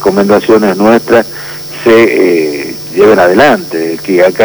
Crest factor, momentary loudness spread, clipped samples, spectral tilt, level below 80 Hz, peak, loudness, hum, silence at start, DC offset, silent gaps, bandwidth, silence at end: 8 dB; 10 LU; 0.5%; -5.5 dB/octave; -44 dBFS; 0 dBFS; -8 LUFS; none; 0 s; under 0.1%; none; over 20 kHz; 0 s